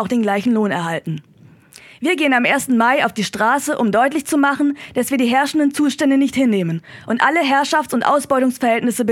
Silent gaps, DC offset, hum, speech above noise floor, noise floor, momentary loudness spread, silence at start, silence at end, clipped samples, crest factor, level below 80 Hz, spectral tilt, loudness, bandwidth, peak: none; under 0.1%; none; 29 dB; -45 dBFS; 7 LU; 0 s; 0 s; under 0.1%; 16 dB; -60 dBFS; -4.5 dB/octave; -17 LUFS; 16.5 kHz; 0 dBFS